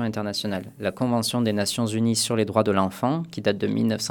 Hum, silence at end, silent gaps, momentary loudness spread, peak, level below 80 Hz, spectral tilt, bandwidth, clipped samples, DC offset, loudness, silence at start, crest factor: none; 0 s; none; 6 LU; -4 dBFS; -62 dBFS; -5 dB/octave; 18.5 kHz; under 0.1%; under 0.1%; -24 LUFS; 0 s; 20 dB